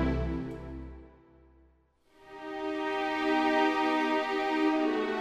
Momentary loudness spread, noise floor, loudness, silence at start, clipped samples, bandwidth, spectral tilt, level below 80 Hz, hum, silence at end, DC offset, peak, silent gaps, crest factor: 18 LU; -66 dBFS; -29 LUFS; 0 s; under 0.1%; 10 kHz; -6 dB/octave; -46 dBFS; none; 0 s; under 0.1%; -14 dBFS; none; 16 dB